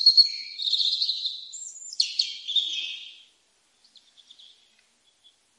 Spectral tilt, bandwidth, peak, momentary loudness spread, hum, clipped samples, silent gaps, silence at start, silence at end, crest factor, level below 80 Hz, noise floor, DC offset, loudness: 6 dB/octave; 11 kHz; -6 dBFS; 17 LU; none; under 0.1%; none; 0 s; 2.45 s; 22 dB; under -90 dBFS; -66 dBFS; under 0.1%; -23 LUFS